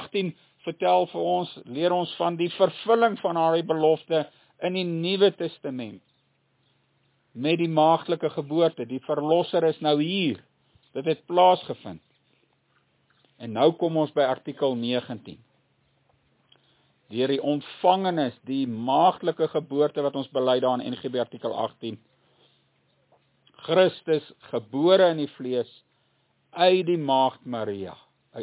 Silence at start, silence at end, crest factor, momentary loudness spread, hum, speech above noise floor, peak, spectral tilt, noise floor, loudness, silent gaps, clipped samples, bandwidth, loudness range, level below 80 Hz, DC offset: 0 s; 0 s; 20 dB; 15 LU; none; 45 dB; -4 dBFS; -10 dB/octave; -69 dBFS; -24 LUFS; none; under 0.1%; 4 kHz; 5 LU; -74 dBFS; under 0.1%